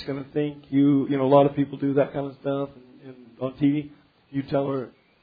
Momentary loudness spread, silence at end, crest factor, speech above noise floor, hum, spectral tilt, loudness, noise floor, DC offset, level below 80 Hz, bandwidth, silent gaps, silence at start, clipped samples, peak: 15 LU; 0.35 s; 20 dB; 23 dB; none; -11 dB/octave; -24 LUFS; -46 dBFS; under 0.1%; -62 dBFS; 4.9 kHz; none; 0 s; under 0.1%; -4 dBFS